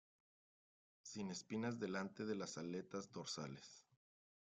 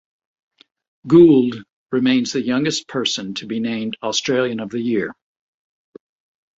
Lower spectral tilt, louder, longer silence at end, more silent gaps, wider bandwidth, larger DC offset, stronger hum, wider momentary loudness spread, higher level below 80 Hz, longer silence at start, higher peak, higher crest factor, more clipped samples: about the same, -4.5 dB/octave vs -5 dB/octave; second, -48 LUFS vs -18 LUFS; second, 0.75 s vs 1.45 s; second, none vs 1.72-1.86 s; first, 9.6 kHz vs 8 kHz; neither; neither; about the same, 13 LU vs 13 LU; second, -86 dBFS vs -60 dBFS; about the same, 1.05 s vs 1.05 s; second, -32 dBFS vs -2 dBFS; about the same, 18 dB vs 18 dB; neither